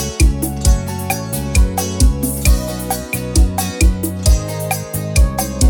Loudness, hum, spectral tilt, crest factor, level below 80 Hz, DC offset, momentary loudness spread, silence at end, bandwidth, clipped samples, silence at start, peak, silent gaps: -17 LUFS; none; -4.5 dB/octave; 14 dB; -16 dBFS; under 0.1%; 5 LU; 0 s; over 20 kHz; under 0.1%; 0 s; -2 dBFS; none